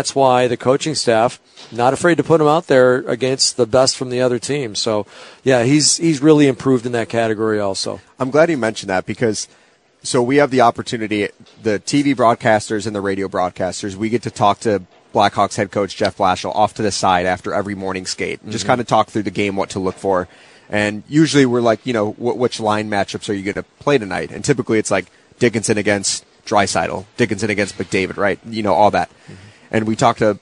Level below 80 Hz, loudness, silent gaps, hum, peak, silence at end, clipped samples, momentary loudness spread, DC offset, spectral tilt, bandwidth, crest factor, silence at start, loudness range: -54 dBFS; -17 LUFS; none; none; 0 dBFS; 0.05 s; under 0.1%; 9 LU; under 0.1%; -4.5 dB/octave; 11 kHz; 16 dB; 0 s; 4 LU